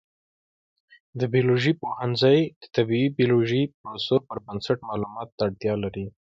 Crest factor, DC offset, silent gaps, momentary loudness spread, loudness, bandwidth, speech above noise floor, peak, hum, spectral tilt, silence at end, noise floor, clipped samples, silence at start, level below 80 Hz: 18 dB; under 0.1%; 2.56-2.61 s, 3.74-3.84 s, 5.32-5.38 s; 11 LU; -24 LUFS; 7.6 kHz; over 66 dB; -8 dBFS; none; -7.5 dB/octave; 0.2 s; under -90 dBFS; under 0.1%; 1.15 s; -58 dBFS